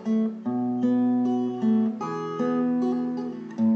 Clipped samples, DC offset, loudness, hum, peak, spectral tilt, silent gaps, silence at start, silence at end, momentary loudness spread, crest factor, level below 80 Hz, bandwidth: under 0.1%; under 0.1%; -26 LUFS; none; -14 dBFS; -8.5 dB/octave; none; 0 s; 0 s; 7 LU; 10 dB; -80 dBFS; 6.6 kHz